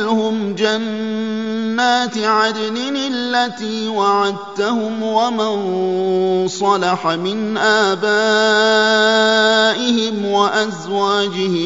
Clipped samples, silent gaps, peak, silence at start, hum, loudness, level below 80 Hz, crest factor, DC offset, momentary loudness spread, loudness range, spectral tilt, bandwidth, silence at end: under 0.1%; none; -2 dBFS; 0 s; none; -16 LUFS; -66 dBFS; 14 dB; 0.3%; 8 LU; 4 LU; -4 dB/octave; 7.8 kHz; 0 s